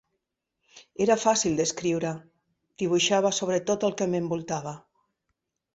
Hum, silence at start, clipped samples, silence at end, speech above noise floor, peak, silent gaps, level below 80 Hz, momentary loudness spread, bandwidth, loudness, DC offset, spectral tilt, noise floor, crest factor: none; 0.75 s; under 0.1%; 0.95 s; 56 dB; -8 dBFS; none; -64 dBFS; 12 LU; 8.2 kHz; -26 LUFS; under 0.1%; -4 dB/octave; -81 dBFS; 20 dB